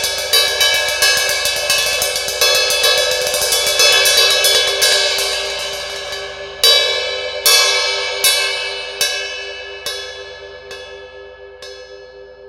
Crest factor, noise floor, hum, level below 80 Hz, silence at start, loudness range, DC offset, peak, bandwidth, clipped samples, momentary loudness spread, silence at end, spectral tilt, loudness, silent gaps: 16 dB; -37 dBFS; none; -48 dBFS; 0 s; 11 LU; under 0.1%; 0 dBFS; 17.5 kHz; under 0.1%; 20 LU; 0 s; 1.5 dB/octave; -13 LUFS; none